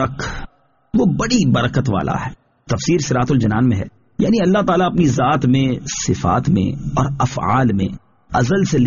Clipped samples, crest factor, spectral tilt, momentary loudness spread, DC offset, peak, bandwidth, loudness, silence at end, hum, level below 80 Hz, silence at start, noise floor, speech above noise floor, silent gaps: under 0.1%; 14 dB; -6.5 dB/octave; 9 LU; under 0.1%; -2 dBFS; 7.4 kHz; -17 LUFS; 0 s; none; -38 dBFS; 0 s; -37 dBFS; 21 dB; none